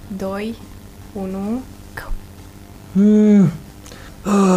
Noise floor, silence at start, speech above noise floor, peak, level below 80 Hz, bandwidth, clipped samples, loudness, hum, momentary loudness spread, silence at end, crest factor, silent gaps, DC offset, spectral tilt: -39 dBFS; 0.05 s; 23 dB; -4 dBFS; -38 dBFS; 14.5 kHz; under 0.1%; -17 LUFS; 50 Hz at -35 dBFS; 25 LU; 0 s; 16 dB; none; under 0.1%; -7.5 dB/octave